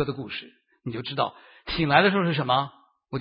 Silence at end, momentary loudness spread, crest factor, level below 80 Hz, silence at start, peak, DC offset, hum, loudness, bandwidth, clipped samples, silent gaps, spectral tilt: 0 s; 17 LU; 24 dB; -52 dBFS; 0 s; -2 dBFS; under 0.1%; none; -24 LUFS; 5.4 kHz; under 0.1%; none; -10 dB/octave